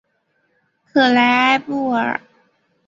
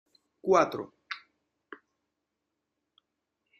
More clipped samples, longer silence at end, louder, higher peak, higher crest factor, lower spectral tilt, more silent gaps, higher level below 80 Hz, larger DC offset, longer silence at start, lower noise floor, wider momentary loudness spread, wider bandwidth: neither; second, 0.7 s vs 2.4 s; first, -16 LUFS vs -28 LUFS; first, -2 dBFS vs -8 dBFS; second, 18 dB vs 26 dB; about the same, -4.5 dB/octave vs -5 dB/octave; neither; first, -66 dBFS vs -76 dBFS; neither; first, 0.95 s vs 0.45 s; second, -66 dBFS vs -84 dBFS; second, 9 LU vs 26 LU; second, 7.6 kHz vs 13.5 kHz